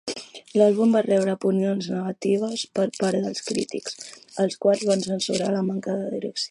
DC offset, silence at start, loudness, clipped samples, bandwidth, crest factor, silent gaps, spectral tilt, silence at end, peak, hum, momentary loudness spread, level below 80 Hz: under 0.1%; 0.05 s; -24 LUFS; under 0.1%; 11.5 kHz; 18 dB; none; -5 dB/octave; 0.05 s; -6 dBFS; none; 11 LU; -70 dBFS